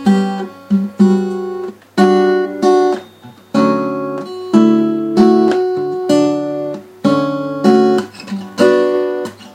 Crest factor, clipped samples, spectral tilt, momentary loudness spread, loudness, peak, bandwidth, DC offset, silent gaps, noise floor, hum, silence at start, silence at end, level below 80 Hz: 14 dB; under 0.1%; -7 dB/octave; 12 LU; -14 LUFS; 0 dBFS; 12.5 kHz; under 0.1%; none; -39 dBFS; none; 0 s; 0.05 s; -56 dBFS